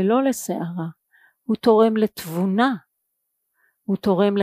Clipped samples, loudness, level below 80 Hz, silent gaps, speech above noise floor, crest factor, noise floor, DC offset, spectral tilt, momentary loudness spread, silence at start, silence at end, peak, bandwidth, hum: under 0.1%; -21 LUFS; -64 dBFS; none; 56 dB; 18 dB; -76 dBFS; under 0.1%; -6 dB/octave; 16 LU; 0 s; 0 s; -4 dBFS; 15.5 kHz; none